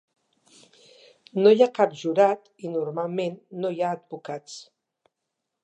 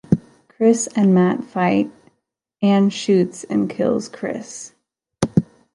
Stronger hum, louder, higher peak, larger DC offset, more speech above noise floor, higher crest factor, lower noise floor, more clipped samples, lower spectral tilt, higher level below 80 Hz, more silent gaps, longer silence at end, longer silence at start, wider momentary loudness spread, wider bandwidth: neither; second, -24 LUFS vs -19 LUFS; second, -6 dBFS vs -2 dBFS; neither; first, 59 dB vs 55 dB; about the same, 20 dB vs 18 dB; first, -82 dBFS vs -72 dBFS; neither; about the same, -6 dB/octave vs -6 dB/octave; second, -84 dBFS vs -54 dBFS; neither; first, 1 s vs 0.3 s; first, 1.35 s vs 0.1 s; first, 17 LU vs 12 LU; second, 8.6 kHz vs 11 kHz